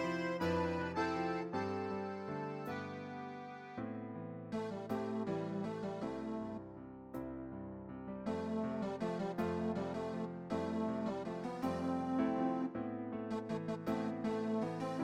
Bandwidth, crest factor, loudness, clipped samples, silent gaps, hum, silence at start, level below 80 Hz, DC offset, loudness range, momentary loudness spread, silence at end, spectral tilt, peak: 15.5 kHz; 16 dB; -40 LUFS; under 0.1%; none; none; 0 s; -66 dBFS; under 0.1%; 5 LU; 10 LU; 0 s; -7 dB/octave; -24 dBFS